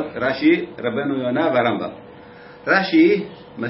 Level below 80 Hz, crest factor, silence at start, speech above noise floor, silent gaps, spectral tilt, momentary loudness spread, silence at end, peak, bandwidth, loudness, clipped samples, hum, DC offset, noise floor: -58 dBFS; 16 dB; 0 s; 23 dB; none; -9.5 dB/octave; 12 LU; 0 s; -4 dBFS; 5.8 kHz; -19 LUFS; under 0.1%; none; under 0.1%; -41 dBFS